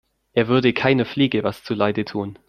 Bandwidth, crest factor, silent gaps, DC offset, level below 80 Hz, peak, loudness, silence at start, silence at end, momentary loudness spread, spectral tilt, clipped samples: 14 kHz; 18 dB; none; under 0.1%; -56 dBFS; -2 dBFS; -20 LUFS; 0.35 s; 0.15 s; 8 LU; -7.5 dB/octave; under 0.1%